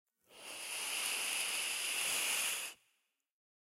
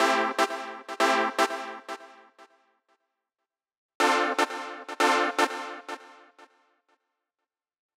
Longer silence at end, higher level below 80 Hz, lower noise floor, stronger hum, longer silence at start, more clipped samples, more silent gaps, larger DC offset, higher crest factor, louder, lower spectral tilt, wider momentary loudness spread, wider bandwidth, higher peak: second, 0.85 s vs 1.85 s; about the same, under -90 dBFS vs under -90 dBFS; second, -81 dBFS vs -88 dBFS; neither; first, 0.3 s vs 0 s; neither; second, none vs 3.77-3.89 s, 3.95-4.00 s; neither; about the same, 20 dB vs 22 dB; second, -35 LUFS vs -26 LUFS; second, 2.5 dB/octave vs -1 dB/octave; second, 13 LU vs 16 LU; second, 16 kHz vs 18.5 kHz; second, -20 dBFS vs -8 dBFS